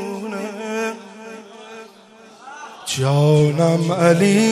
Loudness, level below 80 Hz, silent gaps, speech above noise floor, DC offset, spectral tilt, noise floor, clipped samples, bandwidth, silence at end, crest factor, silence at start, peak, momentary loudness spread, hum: -18 LUFS; -60 dBFS; none; 30 dB; under 0.1%; -6 dB/octave; -45 dBFS; under 0.1%; 14 kHz; 0 s; 18 dB; 0 s; 0 dBFS; 23 LU; none